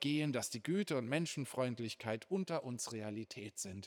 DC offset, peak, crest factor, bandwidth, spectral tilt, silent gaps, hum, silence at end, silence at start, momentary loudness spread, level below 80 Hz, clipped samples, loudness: under 0.1%; -22 dBFS; 18 dB; over 20 kHz; -4.5 dB/octave; none; none; 0 s; 0 s; 8 LU; -86 dBFS; under 0.1%; -40 LUFS